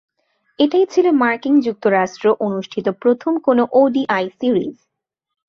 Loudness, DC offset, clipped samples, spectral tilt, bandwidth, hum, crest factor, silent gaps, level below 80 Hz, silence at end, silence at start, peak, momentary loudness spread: -17 LUFS; under 0.1%; under 0.1%; -6 dB/octave; 7 kHz; none; 14 dB; none; -64 dBFS; 0.75 s; 0.6 s; -2 dBFS; 6 LU